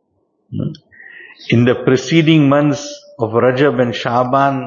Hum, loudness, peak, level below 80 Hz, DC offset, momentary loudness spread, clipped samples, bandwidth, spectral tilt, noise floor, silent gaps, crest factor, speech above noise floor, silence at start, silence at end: none; -14 LUFS; 0 dBFS; -54 dBFS; under 0.1%; 14 LU; under 0.1%; 7.4 kHz; -6.5 dB/octave; -63 dBFS; none; 14 dB; 50 dB; 0.5 s; 0 s